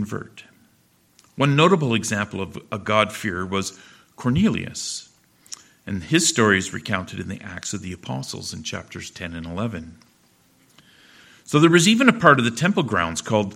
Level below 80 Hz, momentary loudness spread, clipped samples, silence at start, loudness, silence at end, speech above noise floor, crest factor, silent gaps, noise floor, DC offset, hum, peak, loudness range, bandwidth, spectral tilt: -54 dBFS; 17 LU; under 0.1%; 0 s; -21 LUFS; 0 s; 39 dB; 22 dB; none; -60 dBFS; under 0.1%; none; 0 dBFS; 12 LU; 16 kHz; -4.5 dB/octave